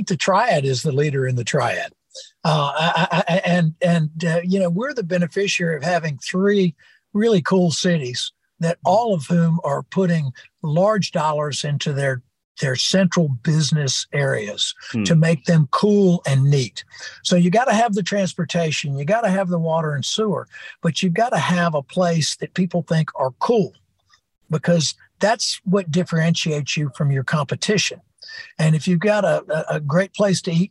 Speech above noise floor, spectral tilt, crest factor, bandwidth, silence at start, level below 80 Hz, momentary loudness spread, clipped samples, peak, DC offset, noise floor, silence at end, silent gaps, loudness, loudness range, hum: 42 dB; -5.5 dB/octave; 14 dB; 11.5 kHz; 0 s; -64 dBFS; 7 LU; under 0.1%; -6 dBFS; under 0.1%; -61 dBFS; 0.05 s; 12.44-12.55 s; -20 LUFS; 3 LU; none